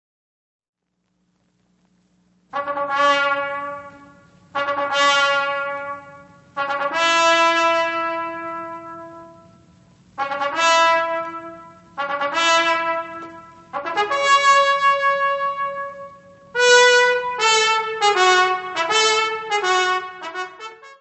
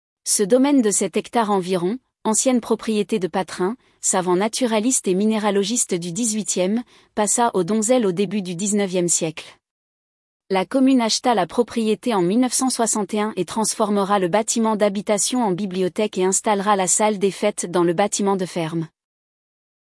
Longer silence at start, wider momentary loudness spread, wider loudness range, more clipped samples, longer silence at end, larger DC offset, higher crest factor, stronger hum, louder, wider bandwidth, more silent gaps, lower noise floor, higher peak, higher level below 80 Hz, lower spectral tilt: first, 2.5 s vs 0.25 s; first, 18 LU vs 6 LU; first, 8 LU vs 2 LU; neither; second, 0.1 s vs 0.95 s; neither; about the same, 20 dB vs 16 dB; neither; about the same, -18 LUFS vs -20 LUFS; second, 8.4 kHz vs 12 kHz; second, none vs 9.71-10.40 s; second, -71 dBFS vs under -90 dBFS; first, 0 dBFS vs -6 dBFS; about the same, -68 dBFS vs -66 dBFS; second, -0.5 dB/octave vs -4 dB/octave